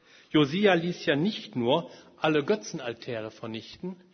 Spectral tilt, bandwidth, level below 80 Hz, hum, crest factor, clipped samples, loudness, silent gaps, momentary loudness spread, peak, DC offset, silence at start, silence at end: -5.5 dB/octave; 6.6 kHz; -68 dBFS; none; 20 dB; under 0.1%; -27 LUFS; none; 15 LU; -8 dBFS; under 0.1%; 0.35 s; 0.2 s